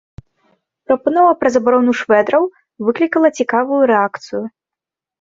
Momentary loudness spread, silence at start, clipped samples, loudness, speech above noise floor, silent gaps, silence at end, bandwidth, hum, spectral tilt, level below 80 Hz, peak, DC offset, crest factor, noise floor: 11 LU; 0.9 s; under 0.1%; -15 LUFS; 72 dB; none; 0.75 s; 7.8 kHz; none; -5.5 dB/octave; -56 dBFS; -2 dBFS; under 0.1%; 14 dB; -86 dBFS